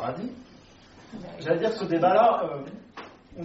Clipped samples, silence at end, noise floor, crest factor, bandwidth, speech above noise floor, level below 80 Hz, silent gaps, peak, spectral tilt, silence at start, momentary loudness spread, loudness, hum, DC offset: under 0.1%; 0 s; -51 dBFS; 18 dB; 7.6 kHz; 26 dB; -62 dBFS; none; -8 dBFS; -4.5 dB/octave; 0 s; 25 LU; -24 LUFS; none; under 0.1%